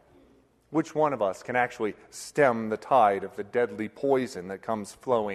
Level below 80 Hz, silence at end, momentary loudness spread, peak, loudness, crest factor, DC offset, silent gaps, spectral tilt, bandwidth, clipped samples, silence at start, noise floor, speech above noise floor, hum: -68 dBFS; 0 s; 11 LU; -8 dBFS; -27 LUFS; 20 dB; under 0.1%; none; -5.5 dB/octave; 13 kHz; under 0.1%; 0.7 s; -61 dBFS; 34 dB; none